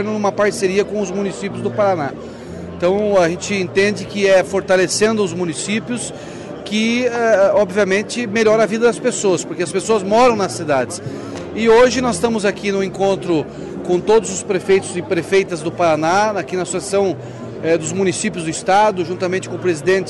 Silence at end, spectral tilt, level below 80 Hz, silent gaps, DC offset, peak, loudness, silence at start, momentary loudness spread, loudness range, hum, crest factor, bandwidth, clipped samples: 0 s; -4.5 dB/octave; -48 dBFS; none; under 0.1%; -4 dBFS; -17 LUFS; 0 s; 10 LU; 3 LU; none; 12 dB; 12 kHz; under 0.1%